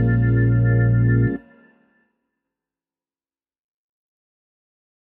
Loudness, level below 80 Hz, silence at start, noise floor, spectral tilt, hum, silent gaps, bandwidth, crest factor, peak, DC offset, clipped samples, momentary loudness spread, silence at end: -18 LUFS; -36 dBFS; 0 s; under -90 dBFS; -13 dB/octave; none; none; 2.2 kHz; 14 dB; -8 dBFS; under 0.1%; under 0.1%; 5 LU; 3.75 s